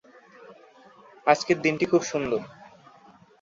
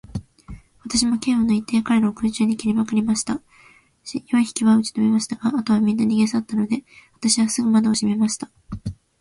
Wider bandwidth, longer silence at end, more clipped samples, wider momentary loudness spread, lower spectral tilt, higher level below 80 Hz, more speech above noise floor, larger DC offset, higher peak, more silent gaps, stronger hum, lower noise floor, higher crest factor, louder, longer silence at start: second, 7.8 kHz vs 11.5 kHz; first, 0.9 s vs 0.25 s; neither; second, 9 LU vs 15 LU; about the same, -4.5 dB/octave vs -4.5 dB/octave; second, -66 dBFS vs -50 dBFS; about the same, 31 dB vs 33 dB; neither; about the same, -4 dBFS vs -4 dBFS; neither; neither; about the same, -54 dBFS vs -53 dBFS; first, 24 dB vs 16 dB; second, -24 LUFS vs -20 LUFS; first, 0.4 s vs 0.15 s